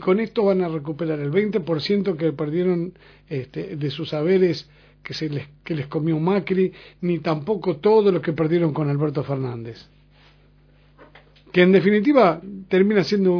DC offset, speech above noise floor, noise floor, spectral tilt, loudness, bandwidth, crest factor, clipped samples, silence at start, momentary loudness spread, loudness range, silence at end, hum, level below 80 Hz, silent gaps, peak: under 0.1%; 33 dB; -54 dBFS; -8 dB/octave; -21 LUFS; 5.4 kHz; 20 dB; under 0.1%; 0 s; 13 LU; 4 LU; 0 s; 50 Hz at -50 dBFS; -58 dBFS; none; -2 dBFS